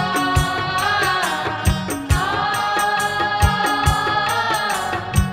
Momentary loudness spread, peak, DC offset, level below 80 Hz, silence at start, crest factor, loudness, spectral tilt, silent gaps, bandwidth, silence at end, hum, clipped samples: 4 LU; -2 dBFS; under 0.1%; -30 dBFS; 0 s; 18 dB; -19 LUFS; -4 dB/octave; none; 16 kHz; 0 s; none; under 0.1%